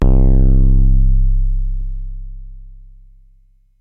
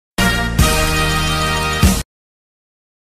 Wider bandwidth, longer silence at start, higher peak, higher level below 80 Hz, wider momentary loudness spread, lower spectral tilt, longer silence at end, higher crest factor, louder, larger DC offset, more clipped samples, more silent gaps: second, 1.2 kHz vs 15.5 kHz; second, 0 s vs 0.2 s; about the same, -2 dBFS vs 0 dBFS; first, -14 dBFS vs -22 dBFS; first, 20 LU vs 3 LU; first, -11 dB/octave vs -4 dB/octave; about the same, 1.1 s vs 1.05 s; second, 10 dB vs 16 dB; about the same, -17 LUFS vs -15 LUFS; neither; neither; neither